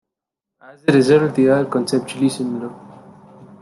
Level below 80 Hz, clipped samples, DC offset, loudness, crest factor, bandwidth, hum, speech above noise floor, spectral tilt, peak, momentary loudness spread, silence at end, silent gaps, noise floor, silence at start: -62 dBFS; under 0.1%; under 0.1%; -17 LUFS; 18 dB; 12 kHz; none; 67 dB; -6.5 dB/octave; -2 dBFS; 12 LU; 0.15 s; none; -84 dBFS; 0.7 s